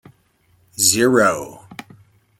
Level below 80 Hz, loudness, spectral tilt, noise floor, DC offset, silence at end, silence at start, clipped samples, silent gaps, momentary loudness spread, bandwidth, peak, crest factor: -60 dBFS; -16 LUFS; -2.5 dB/octave; -59 dBFS; under 0.1%; 0.65 s; 0.8 s; under 0.1%; none; 24 LU; 16.5 kHz; 0 dBFS; 20 dB